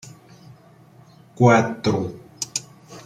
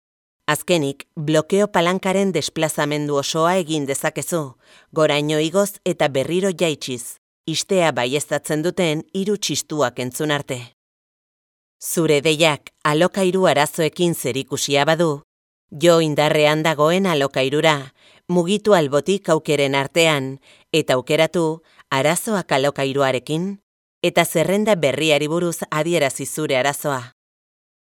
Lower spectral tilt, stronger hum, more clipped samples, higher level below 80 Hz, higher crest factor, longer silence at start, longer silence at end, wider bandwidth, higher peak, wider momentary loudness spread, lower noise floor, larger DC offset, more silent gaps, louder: about the same, -5.5 dB/octave vs -4.5 dB/octave; neither; neither; first, -58 dBFS vs -64 dBFS; about the same, 20 dB vs 20 dB; first, 1.4 s vs 0.5 s; second, 0.05 s vs 0.8 s; second, 14.5 kHz vs 19.5 kHz; about the same, -2 dBFS vs 0 dBFS; first, 16 LU vs 8 LU; second, -50 dBFS vs under -90 dBFS; neither; second, none vs 7.18-7.44 s, 10.73-11.80 s, 15.24-15.68 s, 23.63-24.01 s; about the same, -21 LUFS vs -19 LUFS